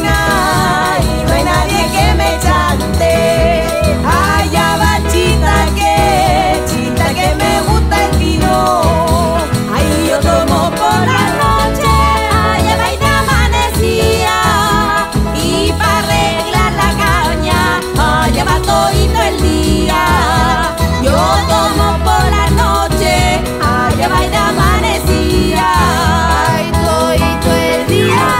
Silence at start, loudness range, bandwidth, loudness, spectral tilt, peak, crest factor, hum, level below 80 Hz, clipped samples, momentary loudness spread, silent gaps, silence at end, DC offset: 0 s; 1 LU; 16.5 kHz; -11 LUFS; -4.5 dB/octave; 0 dBFS; 10 dB; none; -18 dBFS; under 0.1%; 2 LU; none; 0 s; under 0.1%